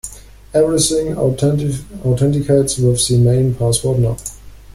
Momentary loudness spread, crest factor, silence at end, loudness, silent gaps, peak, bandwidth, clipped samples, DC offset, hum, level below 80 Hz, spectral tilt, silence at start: 9 LU; 14 dB; 0.05 s; -15 LUFS; none; -2 dBFS; 15 kHz; under 0.1%; under 0.1%; none; -36 dBFS; -5.5 dB/octave; 0.05 s